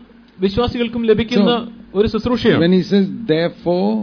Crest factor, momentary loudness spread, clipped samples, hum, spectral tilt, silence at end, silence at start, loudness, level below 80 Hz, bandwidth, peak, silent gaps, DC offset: 14 dB; 6 LU; under 0.1%; none; -7.5 dB/octave; 0 s; 0 s; -17 LUFS; -40 dBFS; 5.4 kHz; -2 dBFS; none; under 0.1%